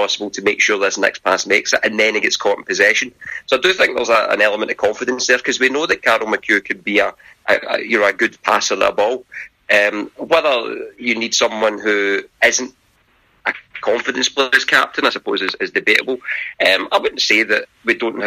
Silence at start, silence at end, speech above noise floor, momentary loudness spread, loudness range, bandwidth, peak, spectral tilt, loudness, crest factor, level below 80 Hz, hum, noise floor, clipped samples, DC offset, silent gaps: 0 s; 0 s; 40 dB; 8 LU; 2 LU; 15.5 kHz; 0 dBFS; -1.5 dB/octave; -16 LUFS; 18 dB; -58 dBFS; none; -57 dBFS; under 0.1%; under 0.1%; none